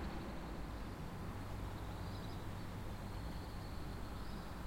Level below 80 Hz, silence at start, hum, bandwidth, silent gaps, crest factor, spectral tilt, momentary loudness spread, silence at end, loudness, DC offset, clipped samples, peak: -50 dBFS; 0 s; none; 16.5 kHz; none; 12 dB; -6 dB/octave; 1 LU; 0 s; -48 LUFS; under 0.1%; under 0.1%; -34 dBFS